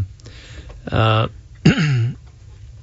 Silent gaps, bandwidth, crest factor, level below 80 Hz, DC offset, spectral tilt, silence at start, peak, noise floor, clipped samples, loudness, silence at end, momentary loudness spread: none; 7.8 kHz; 18 dB; -40 dBFS; under 0.1%; -6.5 dB/octave; 0 s; -2 dBFS; -40 dBFS; under 0.1%; -19 LUFS; 0.05 s; 22 LU